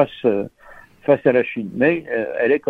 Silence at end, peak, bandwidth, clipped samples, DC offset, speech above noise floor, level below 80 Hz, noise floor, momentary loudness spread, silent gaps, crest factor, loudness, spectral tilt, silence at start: 0 s; -2 dBFS; 4.7 kHz; under 0.1%; under 0.1%; 27 dB; -58 dBFS; -45 dBFS; 9 LU; none; 18 dB; -19 LUFS; -8.5 dB/octave; 0 s